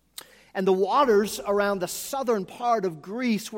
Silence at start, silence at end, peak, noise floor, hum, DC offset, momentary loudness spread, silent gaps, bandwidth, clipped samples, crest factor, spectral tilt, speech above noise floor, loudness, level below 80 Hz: 0.55 s; 0 s; -10 dBFS; -47 dBFS; none; under 0.1%; 10 LU; none; 17 kHz; under 0.1%; 16 dB; -4.5 dB/octave; 23 dB; -25 LUFS; -62 dBFS